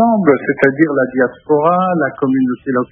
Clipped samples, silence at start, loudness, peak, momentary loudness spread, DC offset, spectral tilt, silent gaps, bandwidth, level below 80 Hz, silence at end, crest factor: under 0.1%; 0 s; -14 LUFS; 0 dBFS; 4 LU; under 0.1%; -10 dB/octave; none; 3.6 kHz; -58 dBFS; 0.05 s; 14 dB